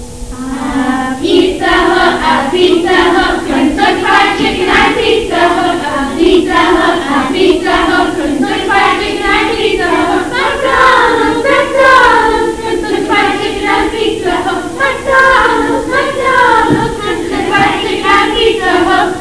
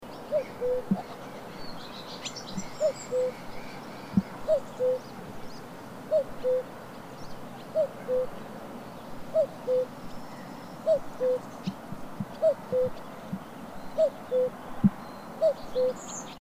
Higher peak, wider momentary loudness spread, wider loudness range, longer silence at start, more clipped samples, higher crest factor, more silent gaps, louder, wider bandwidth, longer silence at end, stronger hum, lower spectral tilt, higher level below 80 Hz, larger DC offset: first, 0 dBFS vs -10 dBFS; second, 7 LU vs 15 LU; about the same, 2 LU vs 3 LU; about the same, 0 s vs 0 s; first, 0.5% vs under 0.1%; second, 10 dB vs 20 dB; neither; first, -10 LUFS vs -31 LUFS; second, 11 kHz vs 15.5 kHz; about the same, 0 s vs 0 s; neither; second, -4 dB/octave vs -6 dB/octave; first, -32 dBFS vs -56 dBFS; first, 2% vs 0.2%